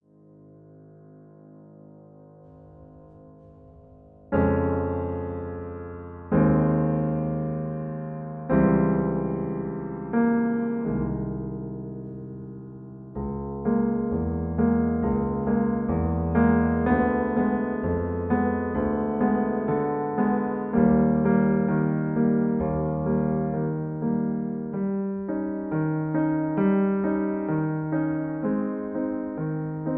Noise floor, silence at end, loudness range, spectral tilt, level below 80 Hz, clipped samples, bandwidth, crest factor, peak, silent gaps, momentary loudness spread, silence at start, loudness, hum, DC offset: -52 dBFS; 0 s; 6 LU; -13.5 dB/octave; -44 dBFS; under 0.1%; 3.2 kHz; 16 dB; -8 dBFS; none; 12 LU; 0.8 s; -25 LUFS; none; under 0.1%